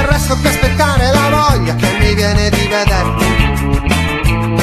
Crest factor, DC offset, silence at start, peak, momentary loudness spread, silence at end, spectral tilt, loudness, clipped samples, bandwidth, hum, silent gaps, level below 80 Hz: 12 dB; under 0.1%; 0 s; 0 dBFS; 3 LU; 0 s; -5 dB/octave; -12 LUFS; under 0.1%; 14.5 kHz; none; none; -18 dBFS